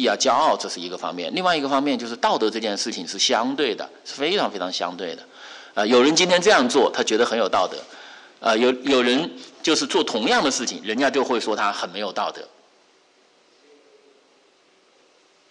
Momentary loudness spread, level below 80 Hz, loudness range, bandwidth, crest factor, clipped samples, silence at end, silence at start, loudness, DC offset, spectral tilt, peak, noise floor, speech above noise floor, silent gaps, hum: 14 LU; -68 dBFS; 7 LU; 11.5 kHz; 16 dB; under 0.1%; 3.05 s; 0 s; -21 LUFS; under 0.1%; -2.5 dB/octave; -6 dBFS; -58 dBFS; 37 dB; none; none